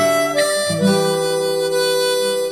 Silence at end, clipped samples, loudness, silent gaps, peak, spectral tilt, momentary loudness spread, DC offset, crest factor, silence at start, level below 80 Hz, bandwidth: 0 s; under 0.1%; -17 LUFS; none; -4 dBFS; -3.5 dB/octave; 2 LU; 0.1%; 12 dB; 0 s; -66 dBFS; 16.5 kHz